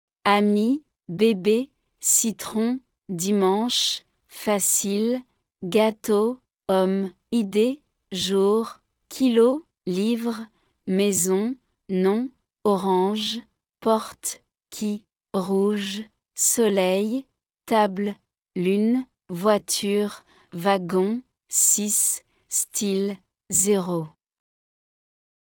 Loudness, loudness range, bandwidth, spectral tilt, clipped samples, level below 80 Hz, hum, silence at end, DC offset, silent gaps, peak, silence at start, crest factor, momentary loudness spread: -23 LUFS; 3 LU; 20 kHz; -3.5 dB/octave; under 0.1%; -70 dBFS; none; 1.4 s; under 0.1%; none; -6 dBFS; 0.25 s; 18 dB; 15 LU